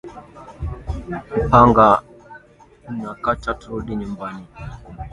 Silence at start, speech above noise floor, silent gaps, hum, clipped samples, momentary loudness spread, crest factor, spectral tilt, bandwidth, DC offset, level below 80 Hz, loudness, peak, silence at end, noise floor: 0.05 s; 30 dB; none; none; under 0.1%; 24 LU; 20 dB; -8 dB/octave; 11 kHz; under 0.1%; -36 dBFS; -18 LUFS; 0 dBFS; 0 s; -49 dBFS